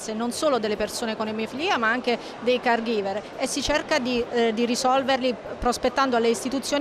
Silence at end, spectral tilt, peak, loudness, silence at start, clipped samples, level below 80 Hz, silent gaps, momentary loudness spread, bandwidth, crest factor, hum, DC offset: 0 s; -3 dB/octave; -12 dBFS; -24 LUFS; 0 s; under 0.1%; -48 dBFS; none; 6 LU; 15 kHz; 12 dB; none; under 0.1%